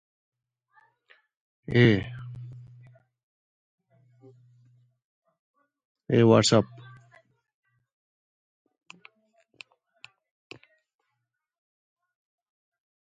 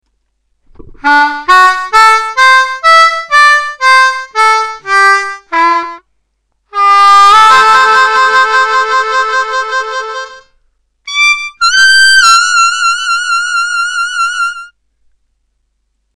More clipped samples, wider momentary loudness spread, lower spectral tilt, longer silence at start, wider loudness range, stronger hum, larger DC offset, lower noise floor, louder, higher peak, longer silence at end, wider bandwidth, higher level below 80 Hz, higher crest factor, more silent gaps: neither; first, 26 LU vs 12 LU; first, -5.5 dB/octave vs 1 dB/octave; first, 1.7 s vs 0.85 s; about the same, 7 LU vs 5 LU; neither; neither; first, -82 dBFS vs -63 dBFS; second, -22 LUFS vs -7 LUFS; second, -6 dBFS vs 0 dBFS; first, 6.4 s vs 1.5 s; second, 9.4 kHz vs 16.5 kHz; second, -60 dBFS vs -46 dBFS; first, 26 dB vs 10 dB; first, 3.23-3.78 s, 5.04-5.22 s, 5.39-5.54 s, 5.85-5.95 s vs none